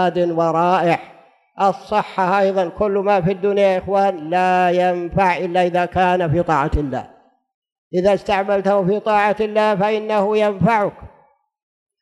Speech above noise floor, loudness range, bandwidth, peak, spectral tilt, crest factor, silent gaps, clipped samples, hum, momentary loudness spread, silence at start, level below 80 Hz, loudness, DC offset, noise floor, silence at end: 39 dB; 2 LU; 12 kHz; -4 dBFS; -7 dB/octave; 14 dB; 7.54-7.62 s, 7.72-7.91 s; under 0.1%; none; 4 LU; 0 s; -40 dBFS; -18 LUFS; under 0.1%; -56 dBFS; 0.95 s